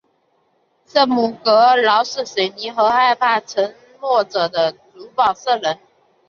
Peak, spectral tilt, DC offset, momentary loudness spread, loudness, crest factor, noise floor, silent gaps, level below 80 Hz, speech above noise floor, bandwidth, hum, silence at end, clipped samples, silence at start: -2 dBFS; -3 dB/octave; under 0.1%; 9 LU; -17 LUFS; 16 dB; -63 dBFS; none; -66 dBFS; 46 dB; 7.2 kHz; none; 0.55 s; under 0.1%; 0.95 s